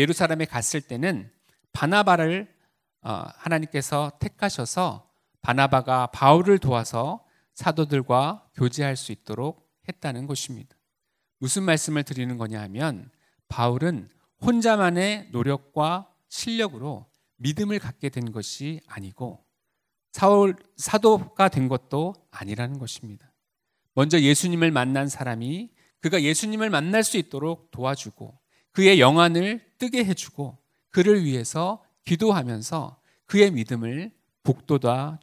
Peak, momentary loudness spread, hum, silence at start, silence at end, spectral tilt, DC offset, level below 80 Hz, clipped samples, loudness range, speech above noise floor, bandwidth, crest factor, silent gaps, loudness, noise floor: 0 dBFS; 16 LU; none; 0 s; 0.05 s; -5 dB/octave; under 0.1%; -58 dBFS; under 0.1%; 7 LU; 57 dB; 16 kHz; 24 dB; none; -23 LUFS; -80 dBFS